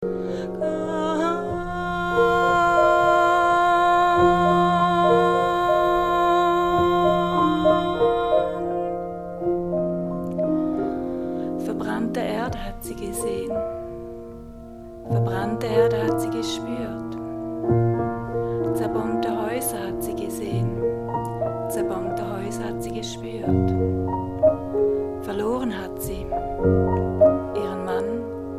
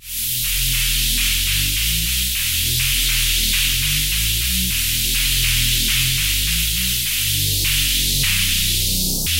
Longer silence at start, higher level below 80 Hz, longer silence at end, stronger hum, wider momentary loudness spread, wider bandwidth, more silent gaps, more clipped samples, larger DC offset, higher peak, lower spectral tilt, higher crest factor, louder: about the same, 0 s vs 0 s; second, -44 dBFS vs -26 dBFS; about the same, 0 s vs 0 s; neither; first, 12 LU vs 2 LU; about the same, 16 kHz vs 16 kHz; neither; neither; second, under 0.1% vs 0.7%; about the same, -6 dBFS vs -6 dBFS; first, -6.5 dB/octave vs -0.5 dB/octave; about the same, 16 dB vs 14 dB; second, -23 LUFS vs -16 LUFS